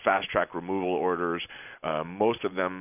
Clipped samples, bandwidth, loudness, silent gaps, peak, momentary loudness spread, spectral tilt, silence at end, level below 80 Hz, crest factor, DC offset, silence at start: under 0.1%; 3.7 kHz; -29 LUFS; none; -8 dBFS; 7 LU; -9 dB/octave; 0 s; -60 dBFS; 22 dB; under 0.1%; 0 s